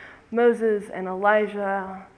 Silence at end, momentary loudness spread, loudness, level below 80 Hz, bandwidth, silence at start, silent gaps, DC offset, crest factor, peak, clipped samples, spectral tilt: 0.1 s; 10 LU; -23 LUFS; -64 dBFS; 11 kHz; 0 s; none; under 0.1%; 18 dB; -6 dBFS; under 0.1%; -6.5 dB/octave